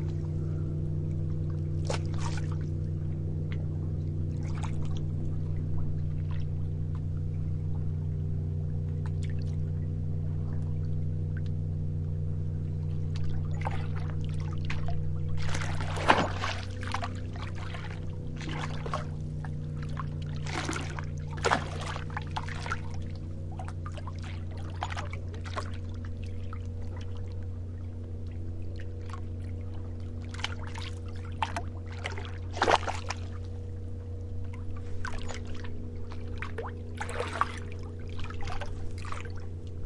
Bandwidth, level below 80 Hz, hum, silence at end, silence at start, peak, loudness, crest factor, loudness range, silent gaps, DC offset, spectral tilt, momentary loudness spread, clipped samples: 11 kHz; -44 dBFS; none; 0 s; 0 s; -4 dBFS; -34 LUFS; 30 dB; 7 LU; none; under 0.1%; -6 dB/octave; 7 LU; under 0.1%